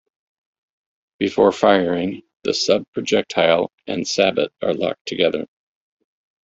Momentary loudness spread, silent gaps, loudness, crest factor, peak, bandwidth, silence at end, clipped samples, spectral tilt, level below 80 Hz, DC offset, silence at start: 10 LU; 2.36-2.40 s, 2.88-2.93 s, 3.73-3.78 s, 5.01-5.05 s; -19 LUFS; 18 dB; -2 dBFS; 7.8 kHz; 1 s; under 0.1%; -4 dB/octave; -60 dBFS; under 0.1%; 1.2 s